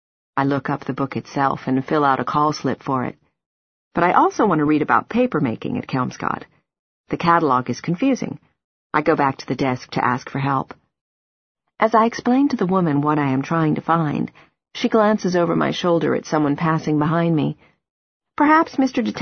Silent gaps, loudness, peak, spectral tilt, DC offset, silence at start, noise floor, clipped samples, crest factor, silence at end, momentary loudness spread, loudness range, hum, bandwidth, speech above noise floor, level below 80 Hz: 3.46-3.91 s, 6.79-7.04 s, 8.64-8.90 s, 11.01-11.55 s, 17.90-18.20 s; -20 LUFS; -2 dBFS; -7 dB/octave; under 0.1%; 0.35 s; under -90 dBFS; under 0.1%; 18 dB; 0 s; 9 LU; 3 LU; none; 6.6 kHz; over 71 dB; -56 dBFS